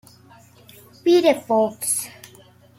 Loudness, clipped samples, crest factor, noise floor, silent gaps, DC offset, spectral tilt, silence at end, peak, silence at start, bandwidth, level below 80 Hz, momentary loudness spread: -19 LUFS; under 0.1%; 18 dB; -50 dBFS; none; under 0.1%; -3 dB/octave; 0.55 s; -4 dBFS; 1.05 s; 16.5 kHz; -70 dBFS; 8 LU